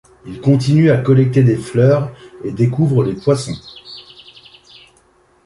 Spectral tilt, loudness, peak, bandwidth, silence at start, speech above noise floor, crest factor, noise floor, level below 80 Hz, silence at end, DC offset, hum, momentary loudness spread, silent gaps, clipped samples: -8 dB/octave; -14 LUFS; -2 dBFS; 11.5 kHz; 0.25 s; 40 dB; 14 dB; -54 dBFS; -48 dBFS; 1.45 s; under 0.1%; none; 21 LU; none; under 0.1%